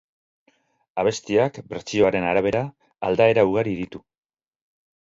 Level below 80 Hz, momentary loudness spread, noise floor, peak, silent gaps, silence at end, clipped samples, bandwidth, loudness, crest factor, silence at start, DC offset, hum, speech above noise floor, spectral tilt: -54 dBFS; 16 LU; -65 dBFS; -4 dBFS; none; 1.05 s; under 0.1%; 7.8 kHz; -22 LUFS; 20 dB; 0.95 s; under 0.1%; none; 44 dB; -5.5 dB/octave